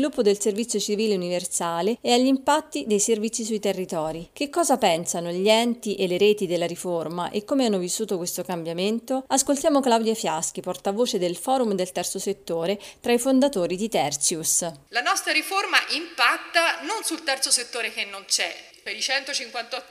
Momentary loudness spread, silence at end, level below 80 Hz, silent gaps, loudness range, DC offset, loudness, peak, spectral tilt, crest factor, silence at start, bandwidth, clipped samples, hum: 8 LU; 0.05 s; -64 dBFS; none; 3 LU; under 0.1%; -23 LUFS; -4 dBFS; -2.5 dB/octave; 20 dB; 0 s; 15.5 kHz; under 0.1%; none